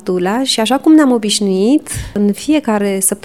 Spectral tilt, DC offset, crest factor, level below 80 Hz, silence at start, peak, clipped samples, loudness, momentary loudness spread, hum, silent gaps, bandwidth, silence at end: -4 dB/octave; 0.4%; 12 dB; -40 dBFS; 0.05 s; 0 dBFS; under 0.1%; -13 LUFS; 7 LU; none; none; 15.5 kHz; 0.05 s